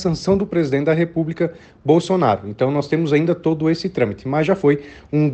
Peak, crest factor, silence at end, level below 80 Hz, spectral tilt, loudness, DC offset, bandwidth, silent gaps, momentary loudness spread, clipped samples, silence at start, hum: -2 dBFS; 16 dB; 0 s; -48 dBFS; -7.5 dB/octave; -19 LUFS; under 0.1%; 8.6 kHz; none; 6 LU; under 0.1%; 0 s; none